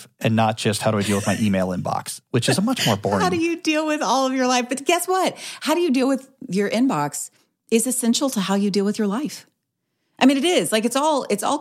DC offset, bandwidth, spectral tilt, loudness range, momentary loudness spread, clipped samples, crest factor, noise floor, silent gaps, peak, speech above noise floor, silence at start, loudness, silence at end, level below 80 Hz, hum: under 0.1%; 16 kHz; -4.5 dB/octave; 1 LU; 7 LU; under 0.1%; 18 dB; -76 dBFS; none; -2 dBFS; 55 dB; 0 s; -21 LUFS; 0 s; -66 dBFS; none